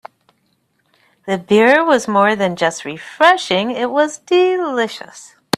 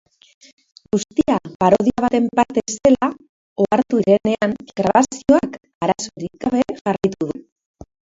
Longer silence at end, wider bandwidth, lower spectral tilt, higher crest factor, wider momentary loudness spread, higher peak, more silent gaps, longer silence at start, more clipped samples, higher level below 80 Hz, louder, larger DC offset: second, 0.3 s vs 0.8 s; first, 13.5 kHz vs 7.8 kHz; second, -4 dB/octave vs -5.5 dB/octave; about the same, 16 dB vs 18 dB; first, 16 LU vs 9 LU; about the same, 0 dBFS vs 0 dBFS; second, none vs 1.55-1.60 s, 3.29-3.56 s, 5.75-5.81 s, 6.81-6.85 s; first, 1.25 s vs 0.95 s; neither; second, -62 dBFS vs -50 dBFS; first, -15 LUFS vs -18 LUFS; neither